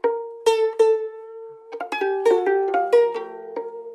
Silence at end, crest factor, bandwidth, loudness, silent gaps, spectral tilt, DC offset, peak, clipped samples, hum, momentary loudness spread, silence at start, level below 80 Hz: 0 s; 16 dB; 12 kHz; -21 LUFS; none; -2.5 dB/octave; under 0.1%; -6 dBFS; under 0.1%; none; 17 LU; 0.05 s; -76 dBFS